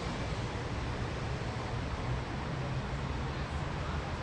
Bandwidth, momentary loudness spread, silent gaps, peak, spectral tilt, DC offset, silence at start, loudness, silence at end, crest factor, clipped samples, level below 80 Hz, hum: 10.5 kHz; 1 LU; none; -22 dBFS; -6 dB/octave; under 0.1%; 0 s; -37 LUFS; 0 s; 12 dB; under 0.1%; -42 dBFS; none